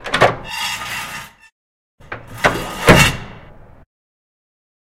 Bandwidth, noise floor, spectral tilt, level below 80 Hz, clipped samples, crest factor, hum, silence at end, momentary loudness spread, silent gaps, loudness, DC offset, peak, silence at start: 17 kHz; -40 dBFS; -4 dB/octave; -34 dBFS; 0.1%; 20 dB; none; 1.45 s; 22 LU; 1.52-1.98 s; -15 LUFS; under 0.1%; 0 dBFS; 0 s